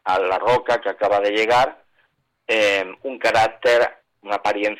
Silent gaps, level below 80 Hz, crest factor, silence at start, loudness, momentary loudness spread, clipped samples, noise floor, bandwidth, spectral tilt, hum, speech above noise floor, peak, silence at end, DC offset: none; -56 dBFS; 12 dB; 0.05 s; -19 LUFS; 7 LU; under 0.1%; -65 dBFS; 14 kHz; -3.5 dB/octave; none; 46 dB; -8 dBFS; 0.05 s; under 0.1%